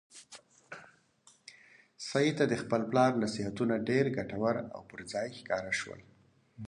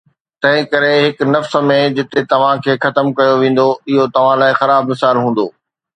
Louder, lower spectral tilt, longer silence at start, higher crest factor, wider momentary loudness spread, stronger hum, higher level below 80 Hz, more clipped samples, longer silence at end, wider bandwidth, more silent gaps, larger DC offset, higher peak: second, -32 LUFS vs -13 LUFS; about the same, -5.5 dB/octave vs -6.5 dB/octave; second, 0.15 s vs 0.4 s; first, 20 dB vs 14 dB; first, 23 LU vs 4 LU; neither; second, -68 dBFS vs -62 dBFS; neither; second, 0 s vs 0.45 s; first, 11.5 kHz vs 9.8 kHz; neither; neither; second, -14 dBFS vs 0 dBFS